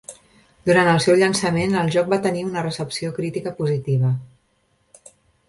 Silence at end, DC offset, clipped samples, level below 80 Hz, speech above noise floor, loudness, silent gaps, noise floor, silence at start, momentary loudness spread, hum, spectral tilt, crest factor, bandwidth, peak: 1.25 s; under 0.1%; under 0.1%; -56 dBFS; 45 dB; -20 LUFS; none; -65 dBFS; 0.1 s; 11 LU; none; -5.5 dB/octave; 18 dB; 11.5 kHz; -4 dBFS